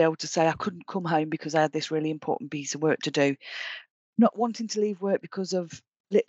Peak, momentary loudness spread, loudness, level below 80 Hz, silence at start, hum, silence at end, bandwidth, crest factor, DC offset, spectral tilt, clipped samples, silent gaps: -8 dBFS; 10 LU; -27 LUFS; -72 dBFS; 0 s; none; 0.05 s; 8.2 kHz; 18 dB; under 0.1%; -5 dB/octave; under 0.1%; 3.90-4.13 s, 5.88-5.92 s, 6.00-6.04 s